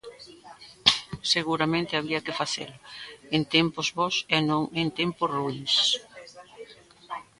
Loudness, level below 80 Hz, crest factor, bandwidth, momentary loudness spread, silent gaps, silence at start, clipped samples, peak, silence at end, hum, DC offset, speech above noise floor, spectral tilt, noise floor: -25 LUFS; -60 dBFS; 26 dB; 11.5 kHz; 22 LU; none; 0.05 s; under 0.1%; -2 dBFS; 0.15 s; none; under 0.1%; 22 dB; -3.5 dB/octave; -49 dBFS